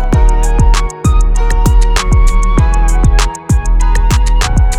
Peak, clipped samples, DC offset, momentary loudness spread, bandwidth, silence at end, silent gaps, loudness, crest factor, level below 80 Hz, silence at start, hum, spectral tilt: 0 dBFS; under 0.1%; under 0.1%; 2 LU; 12 kHz; 0 s; none; -12 LUFS; 8 dB; -8 dBFS; 0 s; none; -5 dB/octave